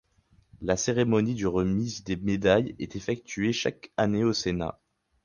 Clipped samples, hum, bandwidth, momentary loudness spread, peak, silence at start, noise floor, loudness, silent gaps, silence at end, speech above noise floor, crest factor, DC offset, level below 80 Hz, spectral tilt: under 0.1%; none; 10 kHz; 9 LU; -8 dBFS; 0.55 s; -64 dBFS; -27 LUFS; none; 0.55 s; 37 dB; 20 dB; under 0.1%; -50 dBFS; -5.5 dB/octave